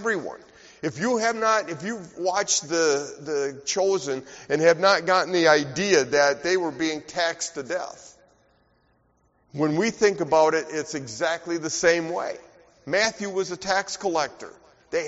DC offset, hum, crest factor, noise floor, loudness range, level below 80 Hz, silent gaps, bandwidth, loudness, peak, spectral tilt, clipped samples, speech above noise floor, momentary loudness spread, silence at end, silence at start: under 0.1%; none; 20 dB; -65 dBFS; 6 LU; -64 dBFS; none; 8 kHz; -24 LUFS; -4 dBFS; -2.5 dB/octave; under 0.1%; 41 dB; 13 LU; 0 s; 0 s